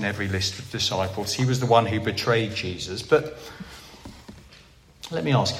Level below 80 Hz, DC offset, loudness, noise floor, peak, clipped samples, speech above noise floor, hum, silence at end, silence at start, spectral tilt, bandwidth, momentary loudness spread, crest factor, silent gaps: -54 dBFS; under 0.1%; -24 LUFS; -51 dBFS; -4 dBFS; under 0.1%; 27 dB; none; 0 s; 0 s; -4.5 dB/octave; 15.5 kHz; 22 LU; 22 dB; none